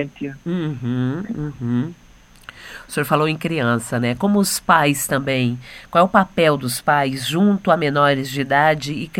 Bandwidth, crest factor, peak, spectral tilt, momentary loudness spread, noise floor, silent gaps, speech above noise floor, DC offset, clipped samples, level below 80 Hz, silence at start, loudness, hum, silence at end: 16.5 kHz; 18 dB; 0 dBFS; -5 dB/octave; 12 LU; -43 dBFS; none; 24 dB; under 0.1%; under 0.1%; -50 dBFS; 0 s; -19 LUFS; none; 0 s